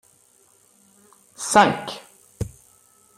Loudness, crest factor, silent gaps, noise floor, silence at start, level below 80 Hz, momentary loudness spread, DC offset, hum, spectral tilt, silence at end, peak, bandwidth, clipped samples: -21 LUFS; 24 dB; none; -58 dBFS; 1.4 s; -52 dBFS; 18 LU; under 0.1%; none; -3.5 dB/octave; 0.7 s; -2 dBFS; 15.5 kHz; under 0.1%